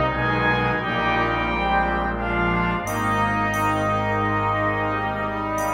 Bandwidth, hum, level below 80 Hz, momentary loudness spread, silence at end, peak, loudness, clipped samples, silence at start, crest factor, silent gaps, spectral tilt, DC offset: 16 kHz; none; -36 dBFS; 3 LU; 0 s; -8 dBFS; -22 LUFS; under 0.1%; 0 s; 12 dB; none; -5.5 dB/octave; under 0.1%